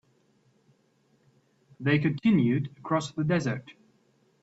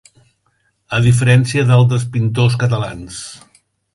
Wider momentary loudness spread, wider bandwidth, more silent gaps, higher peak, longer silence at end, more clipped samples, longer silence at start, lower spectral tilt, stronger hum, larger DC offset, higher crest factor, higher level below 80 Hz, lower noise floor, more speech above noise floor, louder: second, 9 LU vs 16 LU; second, 8 kHz vs 11.5 kHz; neither; second, -10 dBFS vs 0 dBFS; about the same, 0.7 s vs 0.6 s; neither; first, 1.8 s vs 0.9 s; about the same, -7 dB/octave vs -6 dB/octave; neither; neither; about the same, 18 dB vs 16 dB; second, -64 dBFS vs -44 dBFS; first, -67 dBFS vs -63 dBFS; second, 41 dB vs 49 dB; second, -27 LUFS vs -14 LUFS